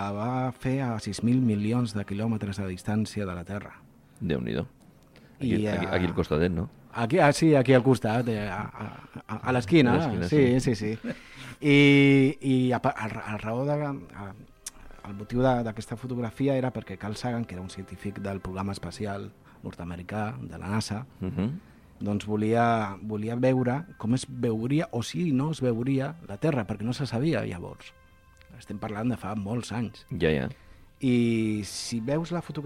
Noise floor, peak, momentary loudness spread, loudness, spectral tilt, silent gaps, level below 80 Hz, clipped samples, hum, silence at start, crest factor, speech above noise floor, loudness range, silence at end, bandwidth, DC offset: -55 dBFS; -8 dBFS; 17 LU; -27 LUFS; -6.5 dB/octave; none; -54 dBFS; under 0.1%; none; 0 s; 20 dB; 29 dB; 10 LU; 0 s; 14.5 kHz; under 0.1%